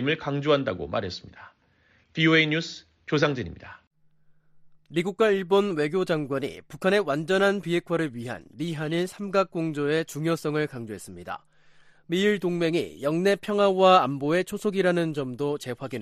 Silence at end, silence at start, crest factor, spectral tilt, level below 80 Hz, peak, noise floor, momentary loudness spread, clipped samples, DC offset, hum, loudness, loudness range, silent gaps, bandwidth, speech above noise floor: 0 s; 0 s; 22 dB; -5.5 dB/octave; -62 dBFS; -4 dBFS; -63 dBFS; 16 LU; under 0.1%; under 0.1%; none; -25 LUFS; 5 LU; 3.87-3.91 s; 14.5 kHz; 38 dB